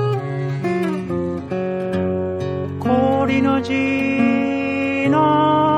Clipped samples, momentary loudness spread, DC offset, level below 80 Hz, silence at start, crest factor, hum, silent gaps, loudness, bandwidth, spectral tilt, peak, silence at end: under 0.1%; 8 LU; under 0.1%; -52 dBFS; 0 s; 14 dB; none; none; -19 LUFS; 10 kHz; -7.5 dB/octave; -6 dBFS; 0 s